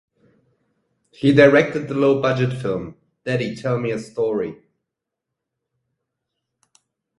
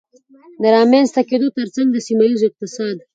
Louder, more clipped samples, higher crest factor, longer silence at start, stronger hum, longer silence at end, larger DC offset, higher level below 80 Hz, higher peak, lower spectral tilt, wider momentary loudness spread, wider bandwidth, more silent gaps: second, -19 LUFS vs -16 LUFS; neither; first, 22 dB vs 16 dB; first, 1.2 s vs 0.6 s; neither; first, 2.65 s vs 0.15 s; neither; first, -58 dBFS vs -68 dBFS; about the same, 0 dBFS vs 0 dBFS; first, -7 dB/octave vs -5 dB/octave; first, 14 LU vs 11 LU; first, 11.5 kHz vs 9 kHz; neither